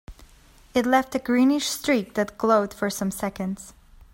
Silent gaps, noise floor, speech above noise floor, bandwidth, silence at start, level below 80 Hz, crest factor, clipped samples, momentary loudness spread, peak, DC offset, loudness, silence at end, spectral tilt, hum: none; -52 dBFS; 29 dB; 16.5 kHz; 0.1 s; -52 dBFS; 18 dB; under 0.1%; 9 LU; -6 dBFS; under 0.1%; -24 LUFS; 0.1 s; -4.5 dB/octave; none